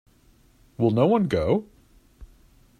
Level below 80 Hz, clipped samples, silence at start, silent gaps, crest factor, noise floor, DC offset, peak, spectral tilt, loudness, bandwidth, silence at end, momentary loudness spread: -50 dBFS; under 0.1%; 0.8 s; none; 18 dB; -58 dBFS; under 0.1%; -8 dBFS; -8.5 dB/octave; -23 LUFS; 13 kHz; 0.55 s; 6 LU